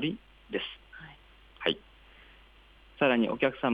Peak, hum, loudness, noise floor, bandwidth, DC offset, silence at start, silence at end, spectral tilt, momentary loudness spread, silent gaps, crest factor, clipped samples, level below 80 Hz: -12 dBFS; none; -30 LUFS; -57 dBFS; 5 kHz; under 0.1%; 0 s; 0 s; -7 dB/octave; 23 LU; none; 20 dB; under 0.1%; -60 dBFS